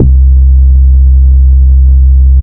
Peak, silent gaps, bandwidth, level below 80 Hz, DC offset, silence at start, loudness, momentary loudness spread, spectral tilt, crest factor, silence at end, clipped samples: 0 dBFS; none; 0.6 kHz; -4 dBFS; under 0.1%; 0 s; -6 LUFS; 0 LU; -15.5 dB/octave; 4 dB; 0 s; 6%